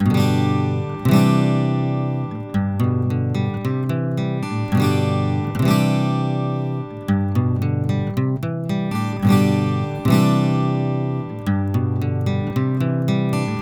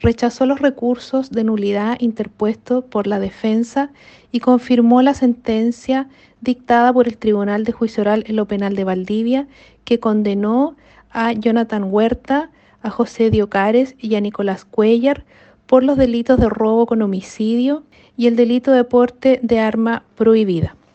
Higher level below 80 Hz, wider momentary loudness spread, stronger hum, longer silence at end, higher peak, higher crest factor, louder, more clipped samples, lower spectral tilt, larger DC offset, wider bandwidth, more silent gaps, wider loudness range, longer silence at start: second, -50 dBFS vs -42 dBFS; about the same, 7 LU vs 8 LU; neither; second, 0 s vs 0.25 s; about the same, -2 dBFS vs 0 dBFS; about the same, 16 dB vs 16 dB; second, -20 LUFS vs -17 LUFS; neither; about the same, -7.5 dB/octave vs -7 dB/octave; neither; first, 17.5 kHz vs 8.2 kHz; neither; about the same, 2 LU vs 3 LU; about the same, 0 s vs 0 s